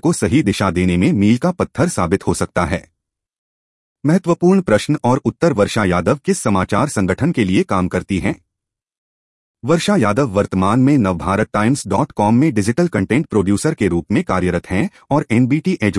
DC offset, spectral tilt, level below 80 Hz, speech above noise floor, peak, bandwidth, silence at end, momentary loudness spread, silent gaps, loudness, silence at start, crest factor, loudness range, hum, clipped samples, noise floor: under 0.1%; -6.5 dB/octave; -44 dBFS; 67 dB; -2 dBFS; 12 kHz; 0 s; 5 LU; 3.38-3.96 s, 8.98-9.54 s; -16 LUFS; 0.05 s; 14 dB; 3 LU; none; under 0.1%; -82 dBFS